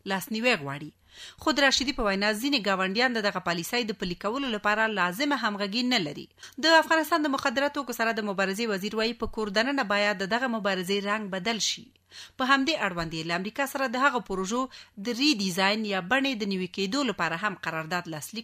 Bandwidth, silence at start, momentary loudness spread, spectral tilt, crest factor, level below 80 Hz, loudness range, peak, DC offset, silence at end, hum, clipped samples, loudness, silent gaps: 15.5 kHz; 0.05 s; 9 LU; -3.5 dB/octave; 20 dB; -54 dBFS; 2 LU; -8 dBFS; under 0.1%; 0 s; none; under 0.1%; -26 LUFS; none